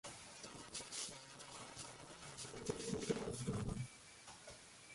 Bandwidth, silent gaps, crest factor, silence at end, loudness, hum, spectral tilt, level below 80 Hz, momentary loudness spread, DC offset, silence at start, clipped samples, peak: 11.5 kHz; none; 22 dB; 0 s; -48 LUFS; none; -4 dB/octave; -64 dBFS; 13 LU; under 0.1%; 0.05 s; under 0.1%; -26 dBFS